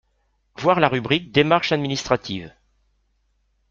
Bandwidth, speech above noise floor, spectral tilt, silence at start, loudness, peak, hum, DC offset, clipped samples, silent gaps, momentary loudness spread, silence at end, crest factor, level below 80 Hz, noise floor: 7.6 kHz; 47 dB; -5 dB/octave; 0.6 s; -20 LUFS; 0 dBFS; none; under 0.1%; under 0.1%; none; 6 LU; 1.2 s; 22 dB; -54 dBFS; -67 dBFS